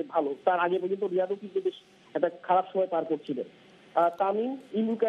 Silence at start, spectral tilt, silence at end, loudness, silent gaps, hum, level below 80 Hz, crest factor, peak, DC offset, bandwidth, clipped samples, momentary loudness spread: 0 s; -7.5 dB/octave; 0 s; -29 LUFS; none; none; -84 dBFS; 18 dB; -10 dBFS; under 0.1%; 6.6 kHz; under 0.1%; 8 LU